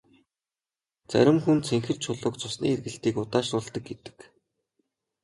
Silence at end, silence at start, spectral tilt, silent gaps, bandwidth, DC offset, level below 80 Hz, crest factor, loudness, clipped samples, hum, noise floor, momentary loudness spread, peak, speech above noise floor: 1 s; 1.1 s; -5.5 dB/octave; none; 11.5 kHz; under 0.1%; -62 dBFS; 22 dB; -26 LUFS; under 0.1%; none; under -90 dBFS; 15 LU; -6 dBFS; over 64 dB